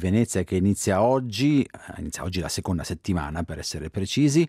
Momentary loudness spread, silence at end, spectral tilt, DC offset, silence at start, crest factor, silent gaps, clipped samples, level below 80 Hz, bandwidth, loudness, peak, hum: 10 LU; 0 s; -5.5 dB/octave; under 0.1%; 0 s; 16 dB; none; under 0.1%; -48 dBFS; 15.5 kHz; -25 LUFS; -8 dBFS; none